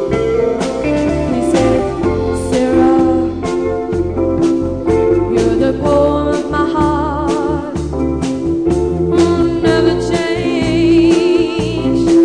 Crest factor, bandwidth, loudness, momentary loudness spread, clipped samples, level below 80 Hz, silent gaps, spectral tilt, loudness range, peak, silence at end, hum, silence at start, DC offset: 12 dB; 10 kHz; -14 LUFS; 6 LU; under 0.1%; -30 dBFS; none; -6.5 dB/octave; 2 LU; -2 dBFS; 0 s; none; 0 s; 0.4%